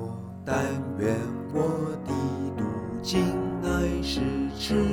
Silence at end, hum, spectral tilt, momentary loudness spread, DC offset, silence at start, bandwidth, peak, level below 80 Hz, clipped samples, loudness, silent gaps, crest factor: 0 s; none; -6 dB/octave; 5 LU; under 0.1%; 0 s; 18 kHz; -12 dBFS; -42 dBFS; under 0.1%; -28 LUFS; none; 16 dB